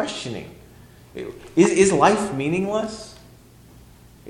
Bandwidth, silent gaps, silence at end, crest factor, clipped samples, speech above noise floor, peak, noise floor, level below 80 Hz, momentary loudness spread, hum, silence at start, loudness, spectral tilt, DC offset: 13 kHz; none; 0 s; 20 dB; under 0.1%; 27 dB; -2 dBFS; -48 dBFS; -52 dBFS; 22 LU; none; 0 s; -20 LUFS; -5 dB/octave; under 0.1%